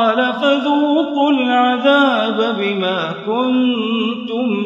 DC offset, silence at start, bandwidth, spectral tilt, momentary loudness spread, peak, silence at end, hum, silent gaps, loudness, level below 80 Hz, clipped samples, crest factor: under 0.1%; 0 s; 7.4 kHz; -6 dB/octave; 7 LU; 0 dBFS; 0 s; none; none; -16 LUFS; -70 dBFS; under 0.1%; 14 dB